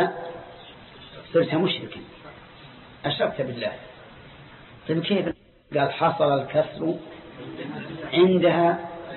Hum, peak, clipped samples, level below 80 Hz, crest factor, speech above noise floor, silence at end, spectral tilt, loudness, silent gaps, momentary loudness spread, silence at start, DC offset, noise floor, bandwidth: none; -8 dBFS; under 0.1%; -58 dBFS; 18 dB; 23 dB; 0 s; -10.5 dB/octave; -24 LUFS; none; 25 LU; 0 s; under 0.1%; -46 dBFS; 4.3 kHz